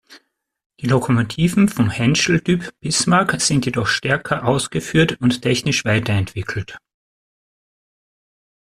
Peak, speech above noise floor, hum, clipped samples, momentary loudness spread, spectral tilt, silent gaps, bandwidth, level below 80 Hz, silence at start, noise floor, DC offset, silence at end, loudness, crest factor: -2 dBFS; 36 dB; none; under 0.1%; 6 LU; -4.5 dB/octave; 0.66-0.70 s; 14 kHz; -48 dBFS; 0.1 s; -54 dBFS; under 0.1%; 2 s; -18 LUFS; 18 dB